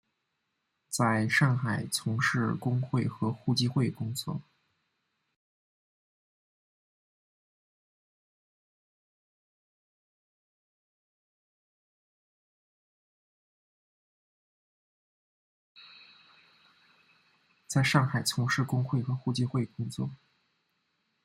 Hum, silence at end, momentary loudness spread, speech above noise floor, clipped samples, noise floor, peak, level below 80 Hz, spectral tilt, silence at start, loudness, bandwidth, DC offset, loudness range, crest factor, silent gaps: none; 1.1 s; 11 LU; 52 dB; under 0.1%; -81 dBFS; -8 dBFS; -72 dBFS; -5 dB/octave; 0.9 s; -29 LUFS; 15 kHz; under 0.1%; 9 LU; 26 dB; 5.36-15.75 s